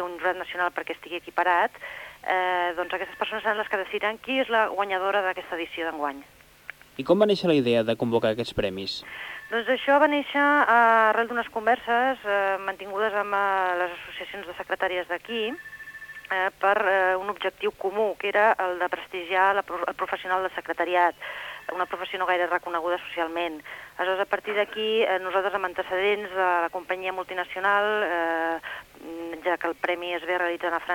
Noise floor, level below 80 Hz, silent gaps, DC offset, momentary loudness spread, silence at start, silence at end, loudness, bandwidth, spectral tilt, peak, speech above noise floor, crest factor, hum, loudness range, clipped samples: -46 dBFS; -62 dBFS; none; under 0.1%; 13 LU; 0 s; 0 s; -25 LUFS; 19 kHz; -5 dB/octave; -8 dBFS; 21 dB; 18 dB; none; 5 LU; under 0.1%